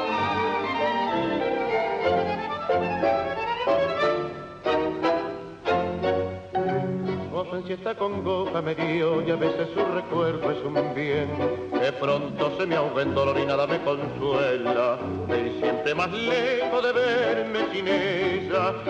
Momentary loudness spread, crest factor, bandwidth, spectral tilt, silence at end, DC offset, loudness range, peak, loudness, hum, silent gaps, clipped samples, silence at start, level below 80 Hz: 5 LU; 14 dB; 8.6 kHz; -6.5 dB/octave; 0 s; under 0.1%; 3 LU; -10 dBFS; -25 LUFS; none; none; under 0.1%; 0 s; -56 dBFS